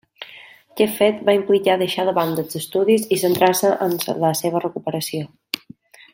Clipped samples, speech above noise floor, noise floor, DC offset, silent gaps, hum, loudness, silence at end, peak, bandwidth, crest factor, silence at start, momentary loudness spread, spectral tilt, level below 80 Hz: under 0.1%; 27 dB; -46 dBFS; under 0.1%; none; none; -19 LUFS; 0.55 s; 0 dBFS; 16.5 kHz; 20 dB; 0.2 s; 13 LU; -4.5 dB/octave; -66 dBFS